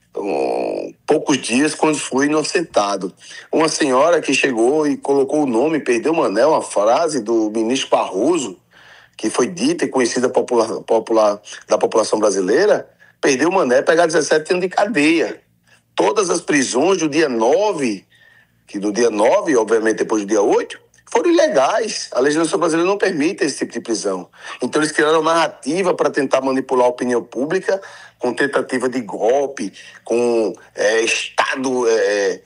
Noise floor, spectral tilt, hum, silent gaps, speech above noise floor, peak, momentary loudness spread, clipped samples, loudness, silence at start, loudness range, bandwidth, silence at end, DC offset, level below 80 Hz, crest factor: -56 dBFS; -3.5 dB/octave; none; none; 39 dB; 0 dBFS; 8 LU; under 0.1%; -17 LUFS; 0.15 s; 3 LU; 12 kHz; 0.05 s; under 0.1%; -68 dBFS; 18 dB